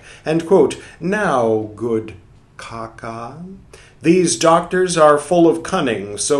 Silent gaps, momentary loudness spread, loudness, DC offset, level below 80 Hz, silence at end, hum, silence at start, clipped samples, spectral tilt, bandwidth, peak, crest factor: none; 19 LU; -16 LUFS; under 0.1%; -50 dBFS; 0 s; none; 0.05 s; under 0.1%; -4.5 dB/octave; 12.5 kHz; 0 dBFS; 18 dB